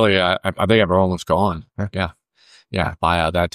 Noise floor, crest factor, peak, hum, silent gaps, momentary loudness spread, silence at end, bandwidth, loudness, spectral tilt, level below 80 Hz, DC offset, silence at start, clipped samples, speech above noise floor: -53 dBFS; 18 dB; -2 dBFS; none; none; 12 LU; 0.05 s; 15 kHz; -19 LUFS; -6 dB/octave; -40 dBFS; under 0.1%; 0 s; under 0.1%; 35 dB